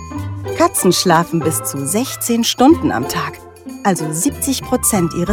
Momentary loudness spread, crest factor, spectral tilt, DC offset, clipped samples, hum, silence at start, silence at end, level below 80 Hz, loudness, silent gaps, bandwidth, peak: 13 LU; 16 dB; -4 dB/octave; under 0.1%; under 0.1%; none; 0 s; 0 s; -44 dBFS; -16 LUFS; none; 18 kHz; 0 dBFS